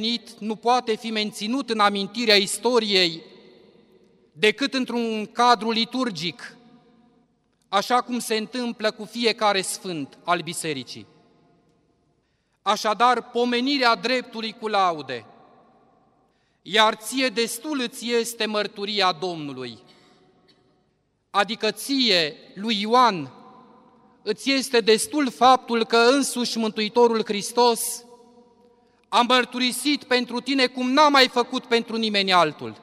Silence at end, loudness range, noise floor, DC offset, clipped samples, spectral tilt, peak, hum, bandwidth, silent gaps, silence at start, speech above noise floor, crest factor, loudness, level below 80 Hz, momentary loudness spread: 0.1 s; 7 LU; -69 dBFS; under 0.1%; under 0.1%; -3 dB/octave; -2 dBFS; none; 16 kHz; none; 0 s; 47 dB; 22 dB; -22 LUFS; -74 dBFS; 12 LU